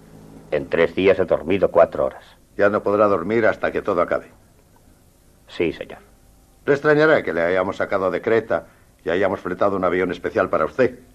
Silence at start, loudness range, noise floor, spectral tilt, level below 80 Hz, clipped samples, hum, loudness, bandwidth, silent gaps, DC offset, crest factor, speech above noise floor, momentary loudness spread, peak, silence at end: 0.3 s; 5 LU; -53 dBFS; -7 dB/octave; -50 dBFS; under 0.1%; none; -20 LUFS; 13 kHz; none; under 0.1%; 18 dB; 34 dB; 9 LU; -2 dBFS; 0.2 s